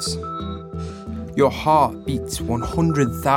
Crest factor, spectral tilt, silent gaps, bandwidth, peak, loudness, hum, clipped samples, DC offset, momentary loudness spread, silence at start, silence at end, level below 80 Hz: 18 dB; -5.5 dB/octave; none; 17.5 kHz; -4 dBFS; -22 LUFS; none; under 0.1%; under 0.1%; 14 LU; 0 s; 0 s; -40 dBFS